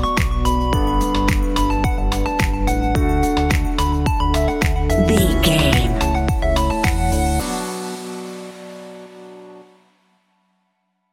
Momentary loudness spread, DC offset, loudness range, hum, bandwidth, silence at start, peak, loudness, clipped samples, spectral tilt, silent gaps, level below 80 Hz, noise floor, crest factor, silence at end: 18 LU; under 0.1%; 11 LU; none; 16.5 kHz; 0 s; 0 dBFS; -19 LUFS; under 0.1%; -5.5 dB/octave; none; -22 dBFS; -70 dBFS; 18 dB; 1.5 s